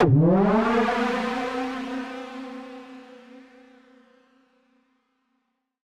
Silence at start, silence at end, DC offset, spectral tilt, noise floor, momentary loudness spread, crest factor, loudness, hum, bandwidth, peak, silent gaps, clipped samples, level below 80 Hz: 0 s; 2.45 s; under 0.1%; -8 dB/octave; -75 dBFS; 24 LU; 18 dB; -23 LUFS; none; 10.5 kHz; -8 dBFS; none; under 0.1%; -52 dBFS